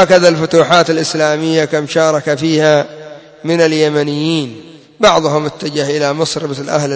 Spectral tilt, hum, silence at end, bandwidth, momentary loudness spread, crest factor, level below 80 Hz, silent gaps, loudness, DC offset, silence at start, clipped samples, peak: -4.5 dB/octave; none; 0 s; 8 kHz; 9 LU; 12 dB; -54 dBFS; none; -13 LUFS; under 0.1%; 0 s; 0.2%; 0 dBFS